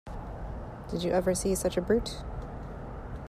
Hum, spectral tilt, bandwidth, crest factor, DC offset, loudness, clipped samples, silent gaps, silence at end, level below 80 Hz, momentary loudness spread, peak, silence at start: none; -5 dB/octave; 15 kHz; 18 dB; under 0.1%; -32 LUFS; under 0.1%; none; 0 s; -42 dBFS; 14 LU; -14 dBFS; 0.05 s